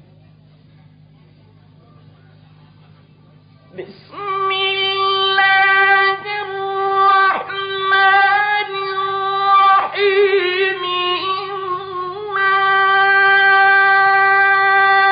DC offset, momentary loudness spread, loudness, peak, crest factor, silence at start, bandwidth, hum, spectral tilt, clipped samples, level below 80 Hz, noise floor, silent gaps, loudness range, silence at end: under 0.1%; 13 LU; -14 LUFS; -4 dBFS; 12 dB; 3.75 s; 5.2 kHz; none; -6.5 dB/octave; under 0.1%; -66 dBFS; -47 dBFS; none; 7 LU; 0 s